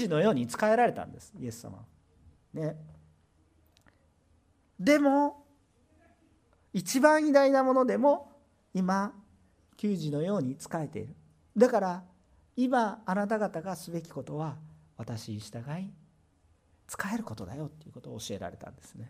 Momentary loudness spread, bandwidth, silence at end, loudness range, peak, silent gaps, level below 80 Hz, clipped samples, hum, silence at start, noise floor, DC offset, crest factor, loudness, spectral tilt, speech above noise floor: 20 LU; 15.5 kHz; 0 s; 14 LU; -8 dBFS; none; -70 dBFS; under 0.1%; none; 0 s; -67 dBFS; under 0.1%; 22 dB; -29 LUFS; -6 dB/octave; 38 dB